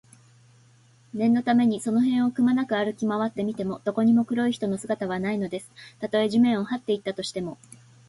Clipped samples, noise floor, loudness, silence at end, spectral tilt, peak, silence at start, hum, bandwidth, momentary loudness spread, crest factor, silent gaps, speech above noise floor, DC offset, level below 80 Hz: under 0.1%; -57 dBFS; -25 LUFS; 0.55 s; -6 dB/octave; -10 dBFS; 1.15 s; none; 11.5 kHz; 12 LU; 16 dB; none; 33 dB; under 0.1%; -64 dBFS